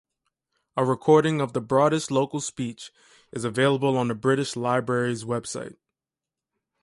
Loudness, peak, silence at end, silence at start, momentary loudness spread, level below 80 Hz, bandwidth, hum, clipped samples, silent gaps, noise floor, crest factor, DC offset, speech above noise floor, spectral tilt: -24 LUFS; -6 dBFS; 1.15 s; 0.75 s; 15 LU; -64 dBFS; 11.5 kHz; none; under 0.1%; none; -89 dBFS; 20 dB; under 0.1%; 65 dB; -5.5 dB/octave